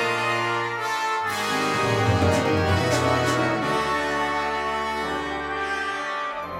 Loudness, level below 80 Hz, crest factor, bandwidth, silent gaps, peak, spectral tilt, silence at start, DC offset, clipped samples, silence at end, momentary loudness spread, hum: -23 LUFS; -52 dBFS; 16 dB; 16.5 kHz; none; -8 dBFS; -4.5 dB/octave; 0 s; under 0.1%; under 0.1%; 0 s; 6 LU; none